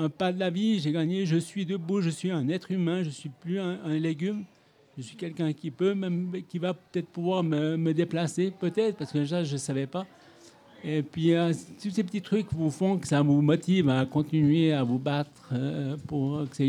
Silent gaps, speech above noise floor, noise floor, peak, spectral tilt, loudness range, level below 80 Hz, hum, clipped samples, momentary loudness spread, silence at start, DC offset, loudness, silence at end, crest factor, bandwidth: none; 27 dB; -54 dBFS; -10 dBFS; -7 dB/octave; 6 LU; -66 dBFS; none; under 0.1%; 10 LU; 0 s; under 0.1%; -28 LUFS; 0 s; 18 dB; 11.5 kHz